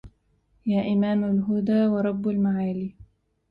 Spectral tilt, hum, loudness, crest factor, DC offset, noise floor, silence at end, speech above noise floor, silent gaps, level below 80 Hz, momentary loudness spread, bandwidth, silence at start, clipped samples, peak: -10.5 dB/octave; none; -24 LUFS; 12 dB; under 0.1%; -66 dBFS; 0.45 s; 43 dB; none; -56 dBFS; 9 LU; 4.5 kHz; 0.05 s; under 0.1%; -12 dBFS